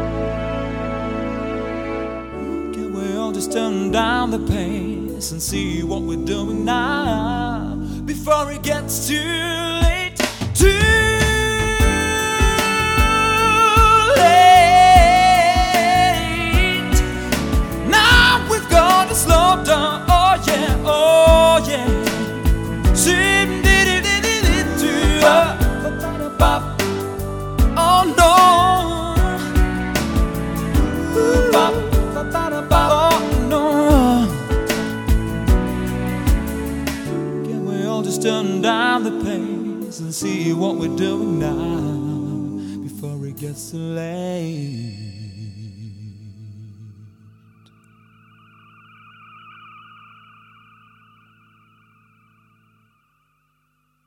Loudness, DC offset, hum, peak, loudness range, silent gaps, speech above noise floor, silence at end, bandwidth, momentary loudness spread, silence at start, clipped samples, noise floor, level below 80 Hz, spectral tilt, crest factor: -17 LUFS; under 0.1%; none; 0 dBFS; 12 LU; none; 45 dB; 7 s; 18 kHz; 14 LU; 0 s; under 0.1%; -66 dBFS; -26 dBFS; -4.5 dB/octave; 18 dB